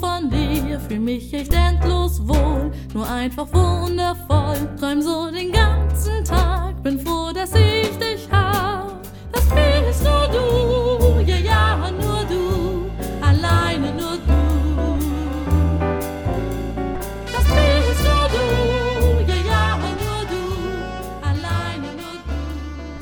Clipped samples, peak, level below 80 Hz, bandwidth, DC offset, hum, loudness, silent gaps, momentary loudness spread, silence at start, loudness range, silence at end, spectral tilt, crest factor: under 0.1%; -2 dBFS; -22 dBFS; 19.5 kHz; under 0.1%; none; -20 LUFS; none; 10 LU; 0 s; 3 LU; 0 s; -6 dB/octave; 16 dB